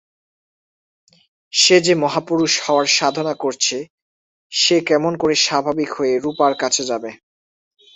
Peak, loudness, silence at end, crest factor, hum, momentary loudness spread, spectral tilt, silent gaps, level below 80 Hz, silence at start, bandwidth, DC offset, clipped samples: -2 dBFS; -17 LUFS; 0.8 s; 18 dB; none; 9 LU; -2.5 dB/octave; 3.90-4.50 s; -62 dBFS; 1.55 s; 8.4 kHz; under 0.1%; under 0.1%